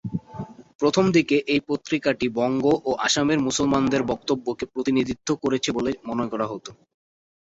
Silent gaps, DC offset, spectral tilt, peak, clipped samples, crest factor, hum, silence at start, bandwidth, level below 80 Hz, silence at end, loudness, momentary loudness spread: 0.75-0.79 s; under 0.1%; -4.5 dB/octave; -6 dBFS; under 0.1%; 18 dB; none; 0.05 s; 8 kHz; -54 dBFS; 0.75 s; -23 LUFS; 11 LU